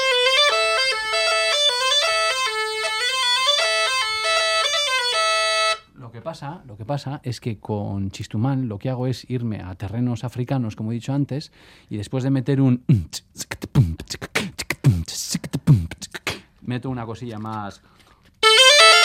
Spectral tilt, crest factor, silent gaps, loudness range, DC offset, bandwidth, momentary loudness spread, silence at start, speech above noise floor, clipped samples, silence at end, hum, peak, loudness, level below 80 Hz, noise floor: -3.5 dB/octave; 20 dB; none; 9 LU; under 0.1%; 16.5 kHz; 15 LU; 0 s; 16 dB; under 0.1%; 0 s; none; 0 dBFS; -19 LUFS; -50 dBFS; -40 dBFS